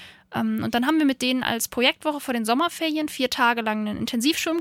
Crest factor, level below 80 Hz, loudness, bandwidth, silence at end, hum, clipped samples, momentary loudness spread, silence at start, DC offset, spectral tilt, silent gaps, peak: 18 dB; -58 dBFS; -23 LUFS; 17 kHz; 0 s; none; under 0.1%; 6 LU; 0 s; under 0.1%; -3 dB/octave; none; -6 dBFS